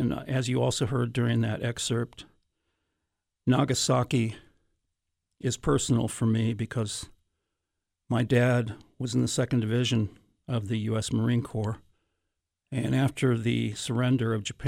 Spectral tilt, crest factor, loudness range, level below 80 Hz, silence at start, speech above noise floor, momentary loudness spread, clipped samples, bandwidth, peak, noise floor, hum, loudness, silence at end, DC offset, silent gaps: -5.5 dB/octave; 16 dB; 2 LU; -54 dBFS; 0 s; 58 dB; 9 LU; under 0.1%; 13.5 kHz; -12 dBFS; -84 dBFS; none; -28 LUFS; 0 s; under 0.1%; none